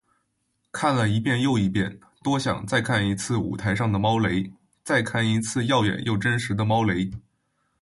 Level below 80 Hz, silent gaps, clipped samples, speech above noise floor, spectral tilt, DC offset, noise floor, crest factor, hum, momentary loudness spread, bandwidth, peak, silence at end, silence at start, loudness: -50 dBFS; none; under 0.1%; 51 dB; -5.5 dB/octave; under 0.1%; -74 dBFS; 16 dB; none; 7 LU; 11.5 kHz; -8 dBFS; 0.6 s; 0.75 s; -24 LUFS